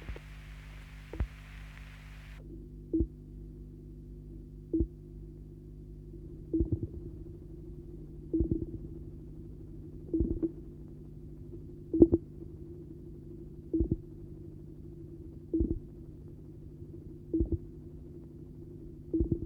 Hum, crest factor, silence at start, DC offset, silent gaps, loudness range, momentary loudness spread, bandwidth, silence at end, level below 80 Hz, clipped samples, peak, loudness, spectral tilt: 50 Hz at -55 dBFS; 30 dB; 0 s; under 0.1%; none; 9 LU; 16 LU; 5.2 kHz; 0 s; -44 dBFS; under 0.1%; -6 dBFS; -36 LUFS; -10 dB/octave